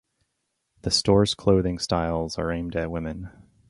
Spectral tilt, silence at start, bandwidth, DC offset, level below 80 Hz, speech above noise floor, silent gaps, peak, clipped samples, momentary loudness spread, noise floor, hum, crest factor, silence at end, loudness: -5 dB/octave; 0.85 s; 11.5 kHz; under 0.1%; -42 dBFS; 54 dB; none; -6 dBFS; under 0.1%; 14 LU; -77 dBFS; none; 20 dB; 0.4 s; -24 LUFS